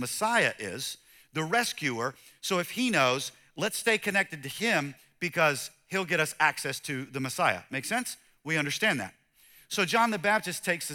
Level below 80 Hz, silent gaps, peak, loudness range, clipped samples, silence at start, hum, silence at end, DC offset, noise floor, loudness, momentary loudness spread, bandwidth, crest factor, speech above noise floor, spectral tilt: -74 dBFS; none; -8 dBFS; 2 LU; under 0.1%; 0 s; none; 0 s; under 0.1%; -59 dBFS; -28 LUFS; 11 LU; 19 kHz; 22 dB; 30 dB; -3 dB/octave